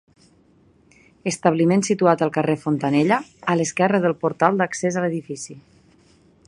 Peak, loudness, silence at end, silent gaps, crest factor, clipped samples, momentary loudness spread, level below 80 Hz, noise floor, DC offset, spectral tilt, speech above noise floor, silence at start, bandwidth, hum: 0 dBFS; -20 LUFS; 0.9 s; none; 20 dB; under 0.1%; 11 LU; -64 dBFS; -56 dBFS; under 0.1%; -5.5 dB/octave; 36 dB; 1.25 s; 11.5 kHz; none